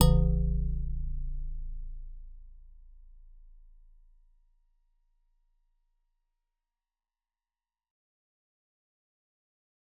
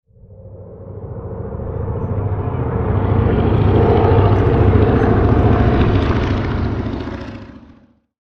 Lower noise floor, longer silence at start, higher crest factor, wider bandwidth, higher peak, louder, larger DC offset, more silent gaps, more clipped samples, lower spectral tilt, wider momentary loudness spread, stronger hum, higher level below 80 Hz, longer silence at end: first, under -90 dBFS vs -48 dBFS; second, 0 s vs 0.3 s; first, 28 dB vs 16 dB; second, 3.9 kHz vs 5.8 kHz; second, -6 dBFS vs 0 dBFS; second, -33 LUFS vs -16 LUFS; neither; neither; neither; about the same, -11 dB/octave vs -10 dB/octave; first, 24 LU vs 17 LU; neither; second, -36 dBFS vs -24 dBFS; first, 6.6 s vs 0.75 s